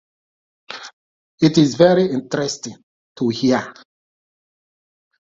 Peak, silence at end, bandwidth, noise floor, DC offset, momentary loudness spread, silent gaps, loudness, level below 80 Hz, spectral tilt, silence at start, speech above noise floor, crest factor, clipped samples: 0 dBFS; 1.5 s; 7.8 kHz; under -90 dBFS; under 0.1%; 21 LU; 0.93-1.38 s, 2.83-3.15 s; -17 LUFS; -58 dBFS; -5.5 dB/octave; 0.7 s; over 73 dB; 20 dB; under 0.1%